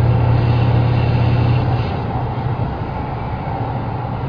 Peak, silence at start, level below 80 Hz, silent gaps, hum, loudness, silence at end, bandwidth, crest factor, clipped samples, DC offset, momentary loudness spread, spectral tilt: -4 dBFS; 0 s; -30 dBFS; none; none; -18 LUFS; 0 s; 5.2 kHz; 12 dB; under 0.1%; under 0.1%; 9 LU; -10 dB/octave